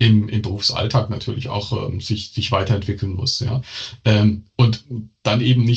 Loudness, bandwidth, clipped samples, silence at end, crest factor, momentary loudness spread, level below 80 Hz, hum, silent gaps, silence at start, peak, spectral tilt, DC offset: -20 LUFS; 8 kHz; under 0.1%; 0 s; 18 dB; 9 LU; -48 dBFS; none; none; 0 s; -2 dBFS; -6 dB/octave; under 0.1%